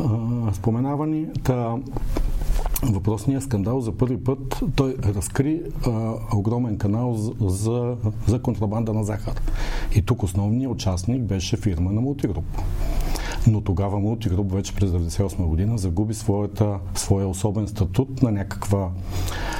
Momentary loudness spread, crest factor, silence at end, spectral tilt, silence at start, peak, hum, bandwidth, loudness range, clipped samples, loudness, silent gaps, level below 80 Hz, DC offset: 6 LU; 18 dB; 0 s; -7 dB/octave; 0 s; -4 dBFS; none; 16.5 kHz; 1 LU; under 0.1%; -24 LUFS; none; -30 dBFS; under 0.1%